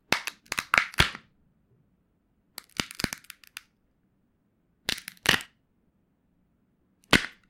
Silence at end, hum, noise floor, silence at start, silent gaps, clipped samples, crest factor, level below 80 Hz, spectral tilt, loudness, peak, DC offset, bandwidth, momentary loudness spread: 0.2 s; none; -71 dBFS; 0.1 s; none; under 0.1%; 30 dB; -50 dBFS; -2.5 dB/octave; -27 LUFS; -2 dBFS; under 0.1%; 17 kHz; 22 LU